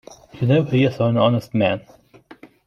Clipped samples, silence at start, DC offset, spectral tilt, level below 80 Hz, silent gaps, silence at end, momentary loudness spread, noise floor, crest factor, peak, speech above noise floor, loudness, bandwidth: under 0.1%; 0.35 s; under 0.1%; -8 dB/octave; -56 dBFS; none; 0.85 s; 6 LU; -46 dBFS; 16 dB; -4 dBFS; 28 dB; -19 LUFS; 7.2 kHz